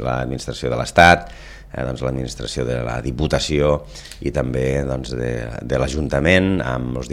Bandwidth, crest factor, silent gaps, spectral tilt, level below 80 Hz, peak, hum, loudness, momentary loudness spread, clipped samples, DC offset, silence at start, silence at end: 14.5 kHz; 20 dB; none; -5.5 dB/octave; -32 dBFS; 0 dBFS; none; -20 LUFS; 14 LU; under 0.1%; under 0.1%; 0 s; 0 s